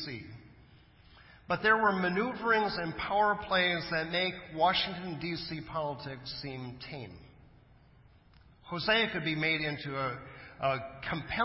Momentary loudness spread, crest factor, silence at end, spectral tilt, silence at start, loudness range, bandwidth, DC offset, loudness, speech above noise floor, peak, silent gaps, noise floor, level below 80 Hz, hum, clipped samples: 15 LU; 20 dB; 0 s; -8.5 dB/octave; 0 s; 11 LU; 5.8 kHz; under 0.1%; -31 LUFS; 28 dB; -14 dBFS; none; -60 dBFS; -58 dBFS; none; under 0.1%